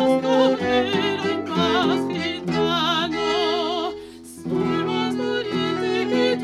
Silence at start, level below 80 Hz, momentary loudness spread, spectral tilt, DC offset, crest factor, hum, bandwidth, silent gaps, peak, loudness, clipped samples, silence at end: 0 s; -58 dBFS; 7 LU; -5 dB/octave; under 0.1%; 16 dB; none; 13 kHz; none; -6 dBFS; -22 LUFS; under 0.1%; 0 s